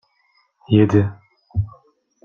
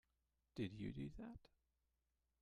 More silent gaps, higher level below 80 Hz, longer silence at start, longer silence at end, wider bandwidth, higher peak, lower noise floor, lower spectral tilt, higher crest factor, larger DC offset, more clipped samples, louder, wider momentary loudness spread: neither; first, -46 dBFS vs -68 dBFS; first, 0.7 s vs 0.55 s; second, 0.55 s vs 0.95 s; second, 6.8 kHz vs 11 kHz; first, -2 dBFS vs -34 dBFS; second, -63 dBFS vs -89 dBFS; first, -9 dB/octave vs -7.5 dB/octave; about the same, 18 dB vs 20 dB; neither; neither; first, -19 LUFS vs -52 LUFS; first, 13 LU vs 10 LU